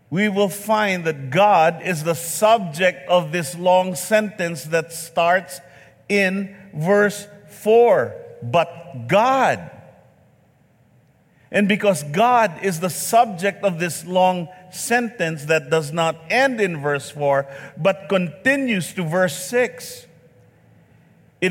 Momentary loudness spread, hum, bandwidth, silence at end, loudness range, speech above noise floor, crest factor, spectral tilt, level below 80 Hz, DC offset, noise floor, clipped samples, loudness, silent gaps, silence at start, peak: 10 LU; none; 17 kHz; 0 s; 4 LU; 37 dB; 16 dB; -4.5 dB/octave; -66 dBFS; under 0.1%; -56 dBFS; under 0.1%; -19 LUFS; none; 0.1 s; -4 dBFS